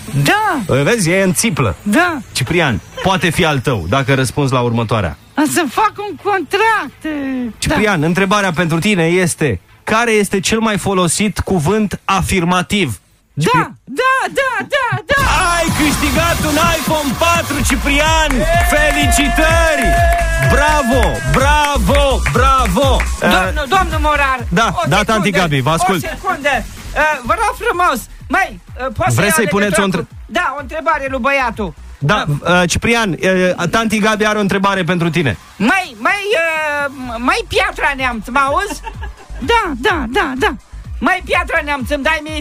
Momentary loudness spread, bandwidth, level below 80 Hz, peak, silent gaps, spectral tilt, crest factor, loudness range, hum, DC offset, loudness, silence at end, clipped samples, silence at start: 7 LU; 16 kHz; -26 dBFS; 0 dBFS; none; -4.5 dB/octave; 14 dB; 4 LU; none; under 0.1%; -14 LUFS; 0 s; under 0.1%; 0 s